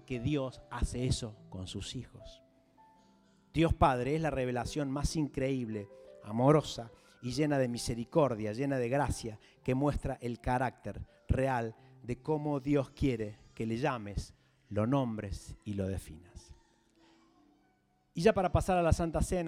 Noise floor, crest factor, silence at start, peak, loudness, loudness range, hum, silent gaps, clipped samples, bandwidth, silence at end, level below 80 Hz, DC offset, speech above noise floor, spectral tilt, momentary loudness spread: -72 dBFS; 20 dB; 0.1 s; -12 dBFS; -33 LUFS; 6 LU; none; none; under 0.1%; 15.5 kHz; 0 s; -46 dBFS; under 0.1%; 39 dB; -6.5 dB/octave; 16 LU